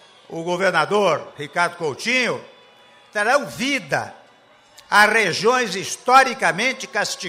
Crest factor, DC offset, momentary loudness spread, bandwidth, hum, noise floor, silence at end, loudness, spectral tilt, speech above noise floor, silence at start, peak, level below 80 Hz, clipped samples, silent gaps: 18 dB; under 0.1%; 12 LU; 16 kHz; none; -52 dBFS; 0 s; -19 LUFS; -3 dB/octave; 33 dB; 0.3 s; -2 dBFS; -66 dBFS; under 0.1%; none